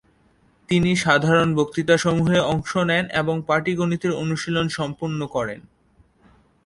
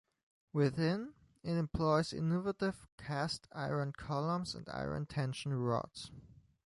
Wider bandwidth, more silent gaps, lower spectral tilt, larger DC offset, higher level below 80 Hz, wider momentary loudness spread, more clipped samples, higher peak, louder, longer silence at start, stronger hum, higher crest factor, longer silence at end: about the same, 11.5 kHz vs 11.5 kHz; second, none vs 2.92-2.98 s; about the same, -5.5 dB/octave vs -6.5 dB/octave; neither; first, -50 dBFS vs -60 dBFS; about the same, 8 LU vs 10 LU; neither; first, -2 dBFS vs -18 dBFS; first, -21 LUFS vs -37 LUFS; first, 0.7 s vs 0.55 s; neither; about the same, 20 dB vs 18 dB; first, 1.05 s vs 0.4 s